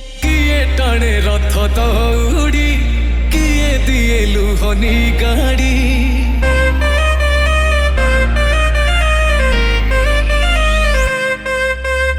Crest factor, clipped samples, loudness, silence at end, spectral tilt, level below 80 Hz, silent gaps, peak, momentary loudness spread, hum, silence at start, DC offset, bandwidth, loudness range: 10 dB; under 0.1%; -14 LUFS; 0 s; -5 dB/octave; -14 dBFS; none; -2 dBFS; 2 LU; none; 0 s; under 0.1%; 15 kHz; 1 LU